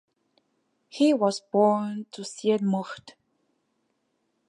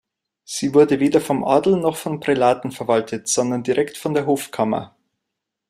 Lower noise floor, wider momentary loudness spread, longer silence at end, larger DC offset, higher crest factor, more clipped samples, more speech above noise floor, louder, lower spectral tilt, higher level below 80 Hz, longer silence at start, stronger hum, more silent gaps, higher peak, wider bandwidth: second, -75 dBFS vs -81 dBFS; first, 17 LU vs 8 LU; first, 1.4 s vs 0.85 s; neither; about the same, 18 dB vs 18 dB; neither; second, 50 dB vs 62 dB; second, -25 LUFS vs -19 LUFS; about the same, -6 dB/octave vs -5 dB/octave; second, -78 dBFS vs -60 dBFS; first, 0.95 s vs 0.5 s; neither; neither; second, -10 dBFS vs -2 dBFS; second, 11.5 kHz vs 15.5 kHz